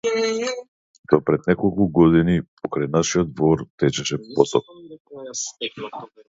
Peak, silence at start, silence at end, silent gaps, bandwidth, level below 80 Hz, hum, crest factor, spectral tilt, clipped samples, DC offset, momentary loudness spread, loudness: 0 dBFS; 0.05 s; 0.25 s; 0.68-1.04 s, 2.48-2.57 s, 3.70-3.78 s, 5.00-5.05 s; 8 kHz; -46 dBFS; none; 20 dB; -5.5 dB/octave; under 0.1%; under 0.1%; 15 LU; -21 LUFS